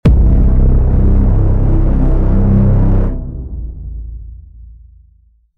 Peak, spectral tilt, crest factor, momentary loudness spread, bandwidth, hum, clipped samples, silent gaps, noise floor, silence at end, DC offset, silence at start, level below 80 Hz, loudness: -2 dBFS; -11.5 dB/octave; 10 dB; 17 LU; 3 kHz; none; under 0.1%; none; -50 dBFS; 0.7 s; under 0.1%; 0.05 s; -12 dBFS; -13 LUFS